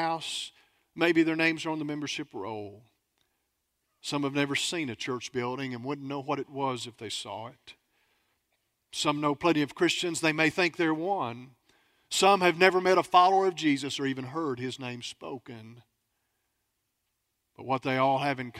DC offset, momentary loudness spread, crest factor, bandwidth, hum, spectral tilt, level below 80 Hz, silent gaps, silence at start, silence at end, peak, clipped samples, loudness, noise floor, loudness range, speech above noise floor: under 0.1%; 17 LU; 24 dB; 15.5 kHz; none; -4 dB/octave; -72 dBFS; none; 0 s; 0 s; -4 dBFS; under 0.1%; -28 LUFS; -80 dBFS; 12 LU; 52 dB